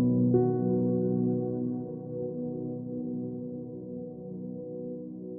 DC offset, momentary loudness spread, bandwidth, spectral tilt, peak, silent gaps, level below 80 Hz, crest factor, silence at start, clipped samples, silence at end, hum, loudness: under 0.1%; 14 LU; 1.6 kHz; -16 dB/octave; -12 dBFS; none; -68 dBFS; 18 dB; 0 s; under 0.1%; 0 s; none; -32 LUFS